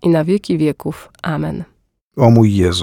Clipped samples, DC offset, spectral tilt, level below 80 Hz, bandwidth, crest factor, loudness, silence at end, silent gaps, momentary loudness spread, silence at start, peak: under 0.1%; under 0.1%; -7 dB/octave; -42 dBFS; 15.5 kHz; 14 dB; -15 LUFS; 0 s; 2.01-2.11 s; 18 LU; 0.05 s; 0 dBFS